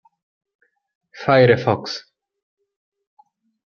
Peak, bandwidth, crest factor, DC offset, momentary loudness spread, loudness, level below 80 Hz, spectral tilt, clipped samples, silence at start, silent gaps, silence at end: -2 dBFS; 7 kHz; 22 dB; under 0.1%; 16 LU; -17 LUFS; -62 dBFS; -6.5 dB/octave; under 0.1%; 1.15 s; none; 1.65 s